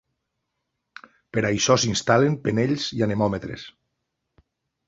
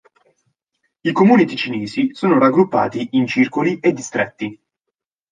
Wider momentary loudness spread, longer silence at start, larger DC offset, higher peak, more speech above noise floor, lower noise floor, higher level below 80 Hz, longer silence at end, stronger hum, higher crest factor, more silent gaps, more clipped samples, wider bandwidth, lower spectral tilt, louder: first, 14 LU vs 10 LU; first, 1.35 s vs 1.05 s; neither; about the same, -2 dBFS vs -2 dBFS; second, 57 dB vs 65 dB; about the same, -79 dBFS vs -81 dBFS; first, -54 dBFS vs -62 dBFS; first, 1.2 s vs 0.8 s; neither; first, 22 dB vs 16 dB; neither; neither; second, 8 kHz vs 9.6 kHz; second, -4.5 dB/octave vs -6 dB/octave; second, -22 LUFS vs -17 LUFS